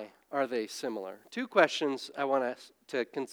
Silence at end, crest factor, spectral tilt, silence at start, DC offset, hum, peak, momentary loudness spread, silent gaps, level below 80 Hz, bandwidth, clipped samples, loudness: 0 s; 24 dB; -3.5 dB/octave; 0 s; under 0.1%; none; -8 dBFS; 13 LU; none; -90 dBFS; over 20 kHz; under 0.1%; -32 LUFS